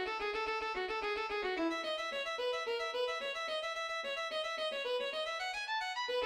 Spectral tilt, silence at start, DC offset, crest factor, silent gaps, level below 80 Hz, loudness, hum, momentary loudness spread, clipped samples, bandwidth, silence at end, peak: -1.5 dB/octave; 0 s; under 0.1%; 12 dB; none; -68 dBFS; -37 LUFS; none; 2 LU; under 0.1%; 15.5 kHz; 0 s; -26 dBFS